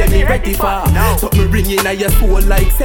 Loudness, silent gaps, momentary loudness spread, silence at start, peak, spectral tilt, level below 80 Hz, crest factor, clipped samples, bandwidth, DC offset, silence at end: -14 LUFS; none; 2 LU; 0 s; 0 dBFS; -5 dB/octave; -12 dBFS; 10 dB; under 0.1%; over 20 kHz; under 0.1%; 0 s